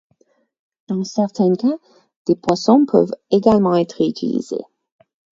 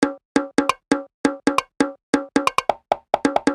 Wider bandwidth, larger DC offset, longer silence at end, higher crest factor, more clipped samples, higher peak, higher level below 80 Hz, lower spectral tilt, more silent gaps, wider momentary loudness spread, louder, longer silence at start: second, 7.8 kHz vs 12.5 kHz; neither; first, 0.75 s vs 0 s; about the same, 18 dB vs 22 dB; neither; about the same, 0 dBFS vs 0 dBFS; about the same, -54 dBFS vs -56 dBFS; first, -7 dB/octave vs -4 dB/octave; second, 2.16-2.25 s vs 0.25-0.35 s, 1.14-1.24 s, 2.03-2.13 s; first, 13 LU vs 4 LU; first, -18 LUFS vs -22 LUFS; first, 0.9 s vs 0 s